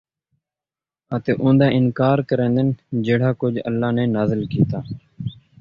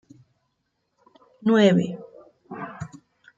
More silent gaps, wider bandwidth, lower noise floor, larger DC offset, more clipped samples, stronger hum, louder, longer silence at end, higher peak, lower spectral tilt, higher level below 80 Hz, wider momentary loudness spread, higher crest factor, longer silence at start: neither; second, 5.8 kHz vs 7.8 kHz; first, under -90 dBFS vs -75 dBFS; neither; neither; neither; about the same, -19 LUFS vs -20 LUFS; second, 0.25 s vs 0.5 s; first, -2 dBFS vs -6 dBFS; first, -10 dB/octave vs -7 dB/octave; first, -50 dBFS vs -66 dBFS; second, 14 LU vs 22 LU; about the same, 18 dB vs 20 dB; second, 1.1 s vs 1.4 s